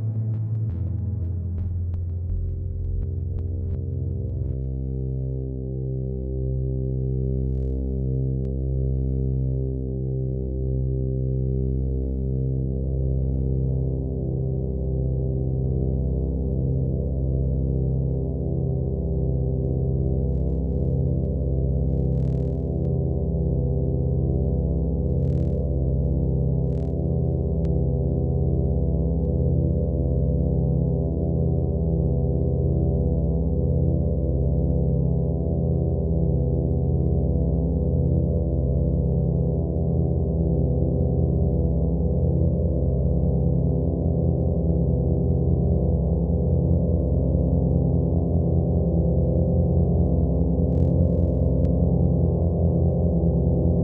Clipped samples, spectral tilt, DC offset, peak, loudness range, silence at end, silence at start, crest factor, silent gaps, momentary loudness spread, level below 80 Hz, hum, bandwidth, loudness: under 0.1%; -15 dB/octave; under 0.1%; -6 dBFS; 6 LU; 0 s; 0 s; 16 dB; none; 6 LU; -28 dBFS; none; 1.2 kHz; -24 LUFS